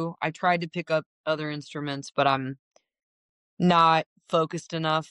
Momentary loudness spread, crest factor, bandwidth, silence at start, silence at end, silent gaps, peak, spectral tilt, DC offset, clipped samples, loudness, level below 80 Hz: 13 LU; 18 dB; 10.5 kHz; 0 s; 0.05 s; 1.06-1.24 s, 2.59-2.71 s, 3.03-3.57 s, 4.06-4.16 s; -8 dBFS; -5.5 dB/octave; under 0.1%; under 0.1%; -26 LUFS; -70 dBFS